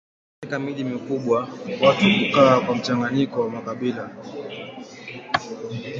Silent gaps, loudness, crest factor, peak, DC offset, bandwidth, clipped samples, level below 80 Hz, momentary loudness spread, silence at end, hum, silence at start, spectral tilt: none; -21 LUFS; 20 dB; -2 dBFS; under 0.1%; 7.6 kHz; under 0.1%; -60 dBFS; 19 LU; 0 s; none; 0.4 s; -6 dB/octave